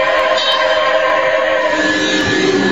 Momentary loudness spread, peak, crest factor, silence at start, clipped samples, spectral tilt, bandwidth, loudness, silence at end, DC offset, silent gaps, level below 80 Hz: 1 LU; -2 dBFS; 12 dB; 0 s; under 0.1%; -3.5 dB/octave; 11 kHz; -13 LUFS; 0 s; 0.9%; none; -46 dBFS